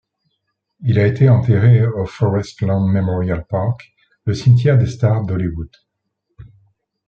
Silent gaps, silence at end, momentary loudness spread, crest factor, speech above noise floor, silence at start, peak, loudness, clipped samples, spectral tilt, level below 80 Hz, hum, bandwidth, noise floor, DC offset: none; 0.65 s; 12 LU; 14 dB; 58 dB; 0.8 s; -2 dBFS; -16 LUFS; under 0.1%; -8.5 dB/octave; -44 dBFS; none; 7 kHz; -73 dBFS; under 0.1%